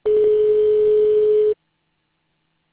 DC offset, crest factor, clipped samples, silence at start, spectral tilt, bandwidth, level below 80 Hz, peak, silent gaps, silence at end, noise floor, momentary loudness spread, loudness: under 0.1%; 8 dB; under 0.1%; 0.05 s; -9.5 dB/octave; 4 kHz; -54 dBFS; -10 dBFS; none; 1.2 s; -70 dBFS; 4 LU; -16 LUFS